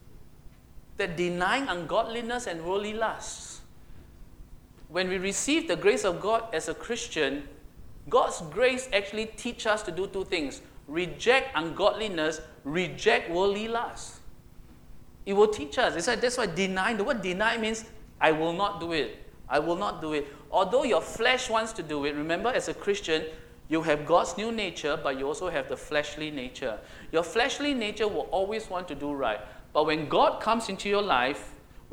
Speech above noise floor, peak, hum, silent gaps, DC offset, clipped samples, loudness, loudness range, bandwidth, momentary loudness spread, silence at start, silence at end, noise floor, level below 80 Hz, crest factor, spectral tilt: 22 dB; -6 dBFS; none; none; under 0.1%; under 0.1%; -28 LUFS; 3 LU; 17.5 kHz; 10 LU; 0.05 s; 0.3 s; -50 dBFS; -52 dBFS; 24 dB; -3.5 dB/octave